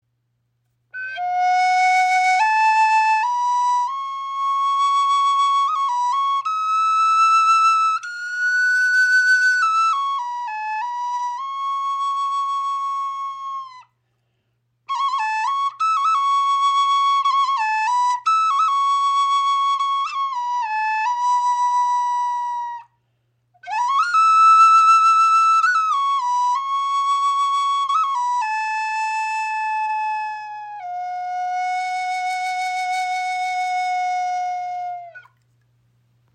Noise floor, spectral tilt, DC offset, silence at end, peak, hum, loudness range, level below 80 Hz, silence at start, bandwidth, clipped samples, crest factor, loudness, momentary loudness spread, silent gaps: -70 dBFS; 2.5 dB/octave; under 0.1%; 1.15 s; -4 dBFS; none; 10 LU; -82 dBFS; 0.95 s; 10.5 kHz; under 0.1%; 16 dB; -18 LUFS; 12 LU; none